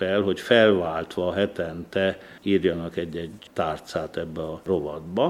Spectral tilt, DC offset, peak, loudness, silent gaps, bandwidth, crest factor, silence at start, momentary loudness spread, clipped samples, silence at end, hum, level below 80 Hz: -6 dB/octave; under 0.1%; -4 dBFS; -25 LUFS; none; 15 kHz; 20 dB; 0 s; 13 LU; under 0.1%; 0 s; none; -54 dBFS